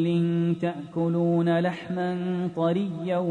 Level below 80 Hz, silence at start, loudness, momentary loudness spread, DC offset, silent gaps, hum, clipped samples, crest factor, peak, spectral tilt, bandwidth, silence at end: -68 dBFS; 0 s; -26 LUFS; 6 LU; under 0.1%; none; none; under 0.1%; 12 dB; -12 dBFS; -9 dB/octave; 4.4 kHz; 0 s